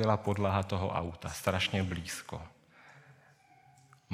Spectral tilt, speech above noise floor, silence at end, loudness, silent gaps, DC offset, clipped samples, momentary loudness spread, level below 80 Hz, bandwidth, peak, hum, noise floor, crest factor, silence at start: -5 dB/octave; 30 dB; 0 s; -33 LUFS; none; under 0.1%; under 0.1%; 13 LU; -58 dBFS; 16 kHz; -12 dBFS; none; -62 dBFS; 24 dB; 0 s